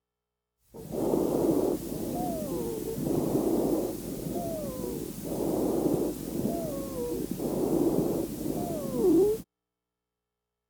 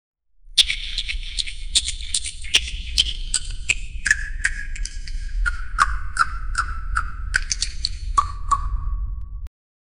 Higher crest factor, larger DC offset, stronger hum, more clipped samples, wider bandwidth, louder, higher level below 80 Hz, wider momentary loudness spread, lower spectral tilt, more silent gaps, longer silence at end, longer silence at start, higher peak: second, 16 dB vs 24 dB; second, under 0.1% vs 1%; first, 60 Hz at -55 dBFS vs none; neither; about the same, over 20 kHz vs over 20 kHz; second, -30 LUFS vs -23 LUFS; second, -52 dBFS vs -28 dBFS; second, 8 LU vs 12 LU; first, -7 dB/octave vs 0 dB/octave; neither; first, 1.25 s vs 0.5 s; first, 0.75 s vs 0.15 s; second, -14 dBFS vs 0 dBFS